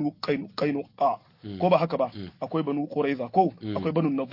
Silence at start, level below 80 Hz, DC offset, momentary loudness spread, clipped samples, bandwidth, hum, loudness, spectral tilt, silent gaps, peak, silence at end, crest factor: 0 s; -70 dBFS; under 0.1%; 8 LU; under 0.1%; 5.8 kHz; none; -27 LUFS; -8.5 dB/octave; none; -8 dBFS; 0 s; 18 dB